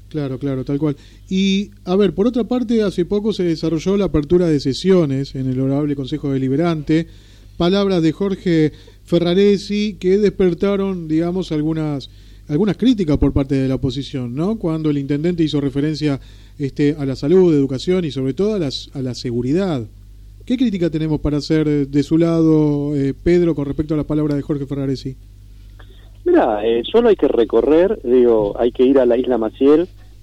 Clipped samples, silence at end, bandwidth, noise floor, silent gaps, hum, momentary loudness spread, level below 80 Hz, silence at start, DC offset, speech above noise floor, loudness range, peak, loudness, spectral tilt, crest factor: under 0.1%; 0.25 s; 10.5 kHz; -39 dBFS; none; none; 9 LU; -38 dBFS; 0.15 s; under 0.1%; 23 dB; 5 LU; -4 dBFS; -17 LUFS; -7.5 dB/octave; 12 dB